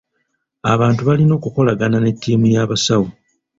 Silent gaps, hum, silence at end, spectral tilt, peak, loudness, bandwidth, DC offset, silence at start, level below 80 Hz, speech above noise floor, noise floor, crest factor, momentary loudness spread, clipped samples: none; none; 0.45 s; -6 dB/octave; -2 dBFS; -16 LUFS; 7.8 kHz; under 0.1%; 0.65 s; -48 dBFS; 55 dB; -70 dBFS; 14 dB; 4 LU; under 0.1%